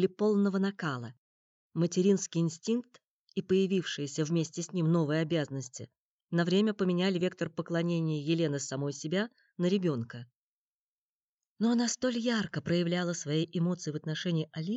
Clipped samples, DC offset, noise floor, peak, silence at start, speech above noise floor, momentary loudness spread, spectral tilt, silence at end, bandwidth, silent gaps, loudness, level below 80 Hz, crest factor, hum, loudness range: under 0.1%; under 0.1%; under -90 dBFS; -14 dBFS; 0 s; over 60 dB; 10 LU; -5.5 dB/octave; 0 s; 8.2 kHz; 1.18-1.70 s, 3.08-3.27 s, 5.98-6.18 s, 10.36-11.38 s, 11.47-11.56 s; -31 LUFS; -76 dBFS; 16 dB; none; 3 LU